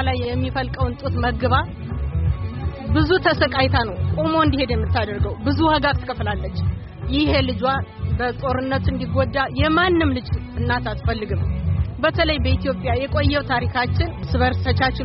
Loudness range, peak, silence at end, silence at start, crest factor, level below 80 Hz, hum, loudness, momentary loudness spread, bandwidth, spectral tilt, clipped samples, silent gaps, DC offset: 2 LU; -4 dBFS; 0 s; 0 s; 16 dB; -30 dBFS; none; -21 LUFS; 7 LU; 5.8 kHz; -5 dB/octave; under 0.1%; none; under 0.1%